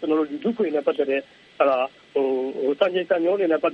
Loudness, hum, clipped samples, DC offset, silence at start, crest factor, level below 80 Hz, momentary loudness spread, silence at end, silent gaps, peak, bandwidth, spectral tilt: -23 LUFS; none; under 0.1%; under 0.1%; 0 s; 18 dB; -74 dBFS; 4 LU; 0 s; none; -4 dBFS; 6.2 kHz; -7 dB/octave